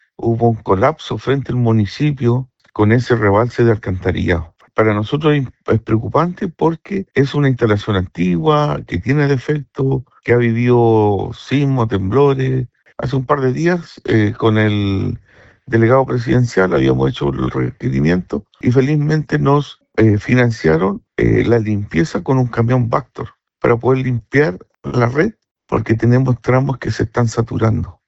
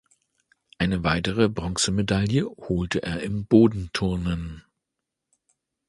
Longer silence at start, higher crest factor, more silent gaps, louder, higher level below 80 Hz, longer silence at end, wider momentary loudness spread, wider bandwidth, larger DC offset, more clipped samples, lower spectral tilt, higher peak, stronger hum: second, 0.2 s vs 0.8 s; about the same, 16 dB vs 20 dB; first, 25.51-25.55 s vs none; first, -16 LUFS vs -24 LUFS; about the same, -40 dBFS vs -42 dBFS; second, 0.15 s vs 1.3 s; second, 7 LU vs 10 LU; second, 8 kHz vs 11.5 kHz; neither; neither; first, -8 dB/octave vs -5.5 dB/octave; first, 0 dBFS vs -4 dBFS; neither